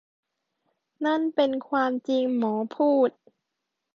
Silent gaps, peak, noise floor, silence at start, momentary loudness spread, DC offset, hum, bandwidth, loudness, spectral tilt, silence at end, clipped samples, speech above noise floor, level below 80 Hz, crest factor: none; -10 dBFS; -83 dBFS; 1 s; 5 LU; under 0.1%; none; 7 kHz; -25 LUFS; -6.5 dB/octave; 0.85 s; under 0.1%; 59 dB; -78 dBFS; 16 dB